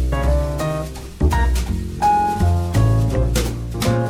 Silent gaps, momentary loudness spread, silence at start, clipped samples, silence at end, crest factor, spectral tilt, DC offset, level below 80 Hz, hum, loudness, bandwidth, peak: none; 7 LU; 0 s; under 0.1%; 0 s; 12 dB; -6 dB/octave; under 0.1%; -22 dBFS; none; -19 LUFS; 16 kHz; -4 dBFS